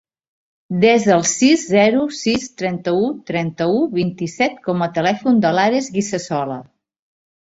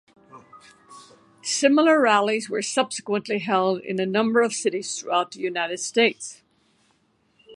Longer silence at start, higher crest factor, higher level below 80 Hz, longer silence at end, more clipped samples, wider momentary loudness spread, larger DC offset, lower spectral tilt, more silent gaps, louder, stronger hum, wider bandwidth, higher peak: first, 0.7 s vs 0.35 s; about the same, 16 dB vs 20 dB; first, -58 dBFS vs -76 dBFS; first, 0.85 s vs 0 s; neither; about the same, 9 LU vs 10 LU; neither; first, -4.5 dB/octave vs -3 dB/octave; neither; first, -17 LUFS vs -22 LUFS; neither; second, 8 kHz vs 11.5 kHz; about the same, -2 dBFS vs -4 dBFS